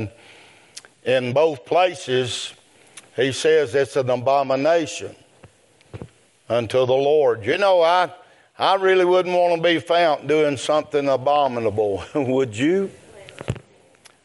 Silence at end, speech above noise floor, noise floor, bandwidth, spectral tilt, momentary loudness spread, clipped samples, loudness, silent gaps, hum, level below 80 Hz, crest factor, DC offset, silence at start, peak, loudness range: 0.65 s; 33 dB; -53 dBFS; 11.5 kHz; -5 dB/octave; 15 LU; under 0.1%; -20 LUFS; none; none; -60 dBFS; 16 dB; under 0.1%; 0 s; -4 dBFS; 4 LU